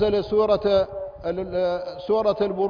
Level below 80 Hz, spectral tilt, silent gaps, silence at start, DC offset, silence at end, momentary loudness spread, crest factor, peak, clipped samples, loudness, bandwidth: -48 dBFS; -7.5 dB/octave; none; 0 s; under 0.1%; 0 s; 9 LU; 14 dB; -8 dBFS; under 0.1%; -23 LUFS; 5.2 kHz